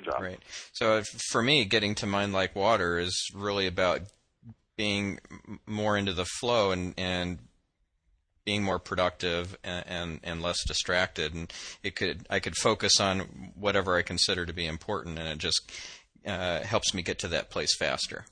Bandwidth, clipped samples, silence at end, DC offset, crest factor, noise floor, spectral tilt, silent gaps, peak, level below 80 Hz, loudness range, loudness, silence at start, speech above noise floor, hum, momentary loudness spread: 10.5 kHz; under 0.1%; 0.1 s; under 0.1%; 22 dB; -74 dBFS; -3 dB/octave; none; -8 dBFS; -52 dBFS; 4 LU; -29 LUFS; 0 s; 44 dB; none; 12 LU